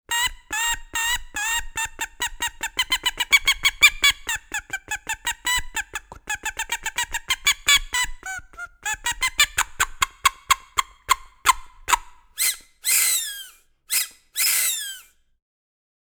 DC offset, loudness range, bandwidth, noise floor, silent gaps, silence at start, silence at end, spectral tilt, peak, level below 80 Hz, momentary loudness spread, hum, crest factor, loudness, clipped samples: under 0.1%; 4 LU; over 20 kHz; -46 dBFS; none; 0.1 s; 1.05 s; 2 dB/octave; 0 dBFS; -42 dBFS; 13 LU; none; 24 dB; -22 LUFS; under 0.1%